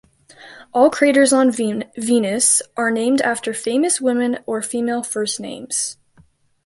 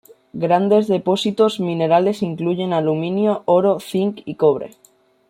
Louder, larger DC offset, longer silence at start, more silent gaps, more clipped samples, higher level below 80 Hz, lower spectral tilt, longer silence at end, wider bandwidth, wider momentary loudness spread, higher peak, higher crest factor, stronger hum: about the same, -18 LUFS vs -18 LUFS; neither; about the same, 0.4 s vs 0.35 s; neither; neither; about the same, -64 dBFS vs -64 dBFS; second, -2.5 dB/octave vs -7 dB/octave; about the same, 0.7 s vs 0.6 s; second, 12 kHz vs 16 kHz; first, 10 LU vs 7 LU; about the same, -2 dBFS vs -2 dBFS; about the same, 18 dB vs 16 dB; neither